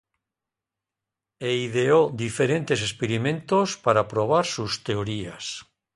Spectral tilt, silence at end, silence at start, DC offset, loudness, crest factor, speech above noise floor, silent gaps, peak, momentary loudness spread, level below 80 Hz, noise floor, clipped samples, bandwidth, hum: -5 dB/octave; 0.35 s; 1.4 s; under 0.1%; -24 LUFS; 20 dB; 64 dB; none; -4 dBFS; 12 LU; -58 dBFS; -88 dBFS; under 0.1%; 11.5 kHz; none